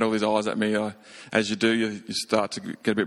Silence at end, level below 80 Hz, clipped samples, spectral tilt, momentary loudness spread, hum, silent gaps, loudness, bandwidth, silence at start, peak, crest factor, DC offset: 0 s; -66 dBFS; under 0.1%; -4.5 dB/octave; 8 LU; none; none; -25 LUFS; 12.5 kHz; 0 s; -6 dBFS; 20 dB; under 0.1%